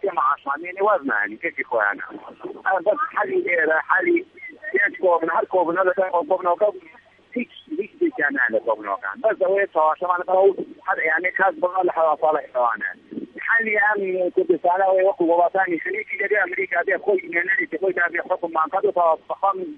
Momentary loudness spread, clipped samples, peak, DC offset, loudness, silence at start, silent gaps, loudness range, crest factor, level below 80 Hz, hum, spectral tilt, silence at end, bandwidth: 9 LU; under 0.1%; -4 dBFS; under 0.1%; -21 LUFS; 0.05 s; none; 3 LU; 18 dB; -74 dBFS; none; -7.5 dB/octave; 0 s; 4 kHz